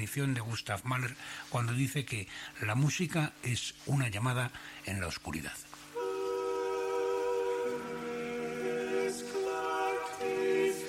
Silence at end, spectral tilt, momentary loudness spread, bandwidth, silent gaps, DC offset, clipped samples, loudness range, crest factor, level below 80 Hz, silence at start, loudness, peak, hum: 0 s; -5 dB/octave; 8 LU; 16 kHz; none; under 0.1%; under 0.1%; 2 LU; 16 dB; -62 dBFS; 0 s; -34 LUFS; -18 dBFS; none